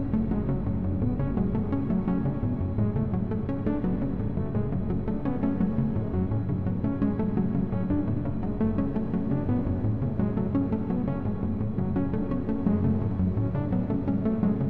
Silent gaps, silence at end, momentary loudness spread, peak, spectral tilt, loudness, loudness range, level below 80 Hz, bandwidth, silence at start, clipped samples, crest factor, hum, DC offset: none; 0 s; 3 LU; -12 dBFS; -12.5 dB/octave; -28 LUFS; 1 LU; -40 dBFS; 4.2 kHz; 0 s; under 0.1%; 14 dB; none; 1%